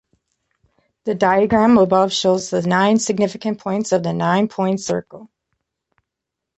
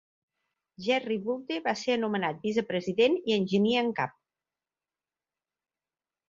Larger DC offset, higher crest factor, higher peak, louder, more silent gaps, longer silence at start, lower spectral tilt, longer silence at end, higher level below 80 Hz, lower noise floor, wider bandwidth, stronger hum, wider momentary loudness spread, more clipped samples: neither; about the same, 16 dB vs 20 dB; first, -2 dBFS vs -10 dBFS; first, -17 LUFS vs -28 LUFS; neither; first, 1.05 s vs 0.8 s; about the same, -5 dB/octave vs -5.5 dB/octave; second, 1.35 s vs 2.2 s; first, -54 dBFS vs -72 dBFS; second, -82 dBFS vs under -90 dBFS; about the same, 8.2 kHz vs 7.6 kHz; neither; first, 11 LU vs 7 LU; neither